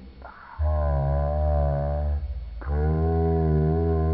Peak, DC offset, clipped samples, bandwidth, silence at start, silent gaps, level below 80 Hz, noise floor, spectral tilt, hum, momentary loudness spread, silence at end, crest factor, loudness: -14 dBFS; under 0.1%; under 0.1%; 4.7 kHz; 0 s; none; -28 dBFS; -43 dBFS; -10 dB/octave; none; 13 LU; 0 s; 10 dB; -25 LUFS